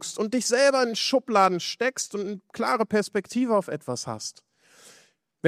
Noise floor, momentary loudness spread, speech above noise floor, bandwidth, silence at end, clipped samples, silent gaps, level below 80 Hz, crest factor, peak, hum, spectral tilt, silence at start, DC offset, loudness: -60 dBFS; 12 LU; 35 dB; 15 kHz; 0 s; under 0.1%; none; -74 dBFS; 20 dB; -6 dBFS; none; -3.5 dB/octave; 0 s; under 0.1%; -25 LUFS